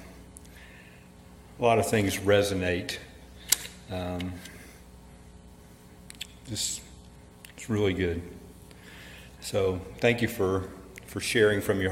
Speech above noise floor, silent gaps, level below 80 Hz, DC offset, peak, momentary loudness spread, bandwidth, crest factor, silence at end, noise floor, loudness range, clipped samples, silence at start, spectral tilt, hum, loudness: 24 dB; none; -54 dBFS; under 0.1%; -2 dBFS; 24 LU; 16.5 kHz; 28 dB; 0 s; -51 dBFS; 10 LU; under 0.1%; 0 s; -4 dB/octave; 60 Hz at -50 dBFS; -28 LUFS